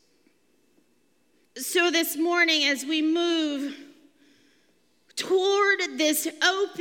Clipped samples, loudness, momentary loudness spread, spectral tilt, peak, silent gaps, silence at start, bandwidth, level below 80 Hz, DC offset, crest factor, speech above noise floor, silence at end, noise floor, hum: under 0.1%; -23 LUFS; 14 LU; -0.5 dB/octave; -6 dBFS; none; 1.55 s; 17 kHz; -88 dBFS; under 0.1%; 20 dB; 44 dB; 0 s; -68 dBFS; none